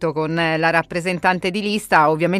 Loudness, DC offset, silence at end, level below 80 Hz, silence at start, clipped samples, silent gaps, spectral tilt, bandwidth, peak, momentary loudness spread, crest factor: -18 LUFS; under 0.1%; 0 s; -54 dBFS; 0 s; under 0.1%; none; -5.5 dB/octave; 15.5 kHz; -2 dBFS; 6 LU; 16 dB